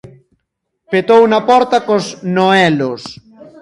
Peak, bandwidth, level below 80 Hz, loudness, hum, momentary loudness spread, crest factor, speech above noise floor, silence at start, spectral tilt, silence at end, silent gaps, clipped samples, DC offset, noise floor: 0 dBFS; 11.5 kHz; -58 dBFS; -12 LUFS; none; 10 LU; 14 dB; 60 dB; 0.9 s; -5.5 dB/octave; 0.5 s; none; under 0.1%; under 0.1%; -72 dBFS